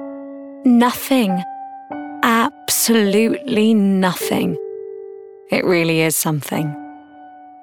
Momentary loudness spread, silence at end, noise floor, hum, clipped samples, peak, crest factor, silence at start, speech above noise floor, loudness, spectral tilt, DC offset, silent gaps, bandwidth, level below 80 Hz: 19 LU; 0 s; -40 dBFS; none; under 0.1%; -2 dBFS; 16 dB; 0 s; 24 dB; -17 LUFS; -4.5 dB/octave; under 0.1%; none; 18 kHz; -62 dBFS